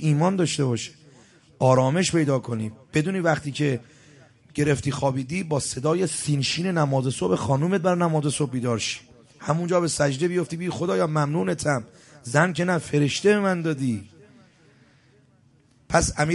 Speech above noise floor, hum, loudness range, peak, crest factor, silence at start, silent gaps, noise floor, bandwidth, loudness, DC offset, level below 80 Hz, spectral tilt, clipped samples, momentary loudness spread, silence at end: 36 dB; none; 2 LU; -4 dBFS; 20 dB; 0 s; none; -59 dBFS; 11.5 kHz; -24 LUFS; under 0.1%; -50 dBFS; -5.5 dB/octave; under 0.1%; 8 LU; 0 s